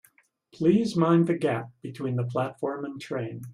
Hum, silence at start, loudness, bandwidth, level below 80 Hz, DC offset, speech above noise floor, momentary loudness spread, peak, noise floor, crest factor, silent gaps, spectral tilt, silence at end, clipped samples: none; 0.6 s; -27 LUFS; 12.5 kHz; -68 dBFS; under 0.1%; 37 dB; 12 LU; -8 dBFS; -62 dBFS; 18 dB; none; -8 dB/octave; 0 s; under 0.1%